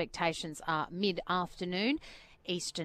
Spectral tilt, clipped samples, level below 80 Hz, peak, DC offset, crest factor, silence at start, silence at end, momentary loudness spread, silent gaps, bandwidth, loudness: -4 dB/octave; under 0.1%; -60 dBFS; -16 dBFS; under 0.1%; 18 dB; 0 s; 0 s; 6 LU; none; 15.5 kHz; -34 LUFS